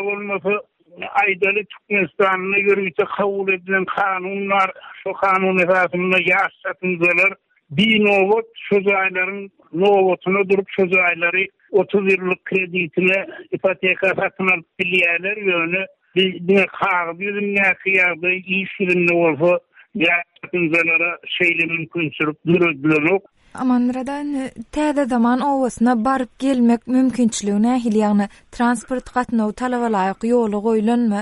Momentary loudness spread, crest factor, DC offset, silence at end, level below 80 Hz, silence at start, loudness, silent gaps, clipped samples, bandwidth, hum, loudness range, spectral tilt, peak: 8 LU; 14 dB; under 0.1%; 0 s; -54 dBFS; 0 s; -18 LUFS; none; under 0.1%; 11.5 kHz; none; 2 LU; -5.5 dB/octave; -6 dBFS